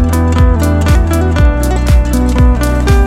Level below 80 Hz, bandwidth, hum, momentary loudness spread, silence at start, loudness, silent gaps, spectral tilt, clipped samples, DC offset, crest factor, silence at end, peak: -10 dBFS; 15.5 kHz; none; 2 LU; 0 s; -11 LUFS; none; -6.5 dB/octave; under 0.1%; under 0.1%; 8 dB; 0 s; 0 dBFS